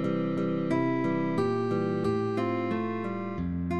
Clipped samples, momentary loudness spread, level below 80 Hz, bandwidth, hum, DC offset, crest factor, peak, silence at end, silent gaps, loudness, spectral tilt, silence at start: under 0.1%; 5 LU; -54 dBFS; 10 kHz; none; 0.3%; 12 dB; -16 dBFS; 0 s; none; -29 LUFS; -8.5 dB/octave; 0 s